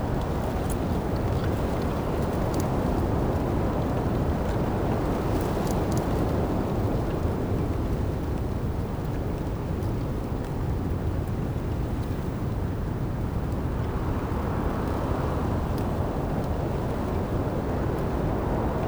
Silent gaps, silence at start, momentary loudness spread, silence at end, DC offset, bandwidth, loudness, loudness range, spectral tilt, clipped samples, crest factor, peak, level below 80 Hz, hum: none; 0 s; 4 LU; 0 s; under 0.1%; over 20 kHz; -28 LUFS; 3 LU; -8 dB/octave; under 0.1%; 14 dB; -12 dBFS; -32 dBFS; none